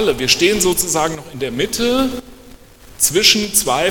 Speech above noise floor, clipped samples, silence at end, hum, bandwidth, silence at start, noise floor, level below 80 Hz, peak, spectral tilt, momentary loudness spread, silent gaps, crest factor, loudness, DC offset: 25 dB; under 0.1%; 0 s; none; 19 kHz; 0 s; -41 dBFS; -40 dBFS; 0 dBFS; -2 dB/octave; 11 LU; none; 16 dB; -15 LUFS; under 0.1%